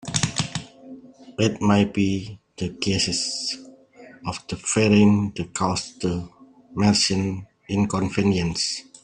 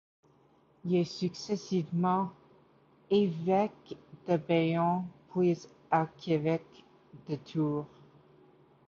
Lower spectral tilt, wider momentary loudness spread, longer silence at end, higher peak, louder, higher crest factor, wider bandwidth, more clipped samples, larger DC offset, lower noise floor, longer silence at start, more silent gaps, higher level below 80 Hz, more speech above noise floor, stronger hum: second, -4.5 dB/octave vs -7.5 dB/octave; first, 16 LU vs 12 LU; second, 0.25 s vs 1 s; first, -2 dBFS vs -14 dBFS; first, -23 LUFS vs -31 LUFS; about the same, 20 dB vs 18 dB; first, 10.5 kHz vs 7.4 kHz; neither; neither; second, -47 dBFS vs -65 dBFS; second, 0.05 s vs 0.85 s; neither; first, -52 dBFS vs -72 dBFS; second, 26 dB vs 35 dB; neither